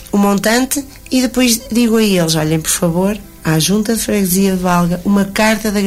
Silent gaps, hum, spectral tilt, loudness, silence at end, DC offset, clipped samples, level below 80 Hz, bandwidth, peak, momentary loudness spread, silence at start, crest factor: none; none; -4.5 dB/octave; -14 LUFS; 0 s; under 0.1%; under 0.1%; -38 dBFS; 16 kHz; -2 dBFS; 5 LU; 0 s; 12 dB